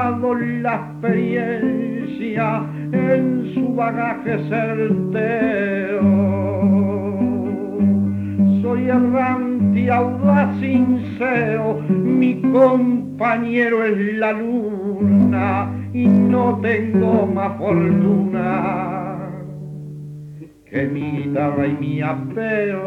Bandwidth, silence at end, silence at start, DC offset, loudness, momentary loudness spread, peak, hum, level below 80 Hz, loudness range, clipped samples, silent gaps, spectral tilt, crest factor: 4.3 kHz; 0 s; 0 s; under 0.1%; -18 LUFS; 8 LU; -2 dBFS; none; -56 dBFS; 5 LU; under 0.1%; none; -10 dB/octave; 16 dB